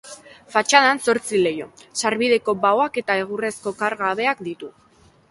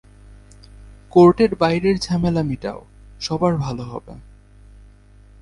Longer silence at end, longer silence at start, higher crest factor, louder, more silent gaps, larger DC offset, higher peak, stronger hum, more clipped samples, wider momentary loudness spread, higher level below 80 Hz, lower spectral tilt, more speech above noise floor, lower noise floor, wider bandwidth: second, 0.6 s vs 1.2 s; second, 0.05 s vs 0.85 s; about the same, 20 dB vs 18 dB; about the same, -20 LUFS vs -18 LUFS; neither; neither; about the same, 0 dBFS vs -2 dBFS; neither; neither; about the same, 16 LU vs 18 LU; second, -66 dBFS vs -42 dBFS; second, -2.5 dB/octave vs -7 dB/octave; second, 22 dB vs 29 dB; second, -43 dBFS vs -47 dBFS; about the same, 11.5 kHz vs 11 kHz